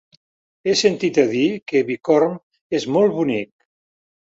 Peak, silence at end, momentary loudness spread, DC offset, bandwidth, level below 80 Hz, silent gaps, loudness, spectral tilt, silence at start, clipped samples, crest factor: -2 dBFS; 0.8 s; 9 LU; under 0.1%; 8 kHz; -64 dBFS; 1.62-1.66 s, 2.43-2.51 s, 2.61-2.70 s; -19 LUFS; -4.5 dB/octave; 0.65 s; under 0.1%; 18 dB